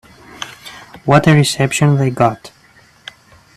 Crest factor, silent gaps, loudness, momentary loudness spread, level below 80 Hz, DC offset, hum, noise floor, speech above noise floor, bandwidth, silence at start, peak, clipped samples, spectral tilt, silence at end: 16 dB; none; -13 LUFS; 25 LU; -48 dBFS; under 0.1%; none; -48 dBFS; 36 dB; 14 kHz; 0.4 s; 0 dBFS; under 0.1%; -5.5 dB/octave; 1.1 s